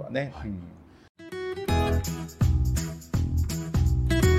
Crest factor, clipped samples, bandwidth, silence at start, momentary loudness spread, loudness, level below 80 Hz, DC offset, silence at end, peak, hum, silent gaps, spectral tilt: 16 dB; under 0.1%; 15 kHz; 0 s; 13 LU; -28 LUFS; -30 dBFS; under 0.1%; 0 s; -10 dBFS; none; 1.09-1.15 s; -6 dB/octave